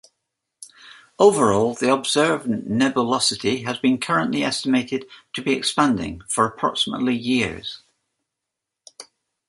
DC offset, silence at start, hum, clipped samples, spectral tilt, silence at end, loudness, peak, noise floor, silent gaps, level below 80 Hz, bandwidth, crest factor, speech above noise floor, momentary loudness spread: under 0.1%; 0.6 s; none; under 0.1%; -4 dB/octave; 0.45 s; -20 LUFS; -2 dBFS; -83 dBFS; none; -54 dBFS; 11.5 kHz; 20 dB; 63 dB; 11 LU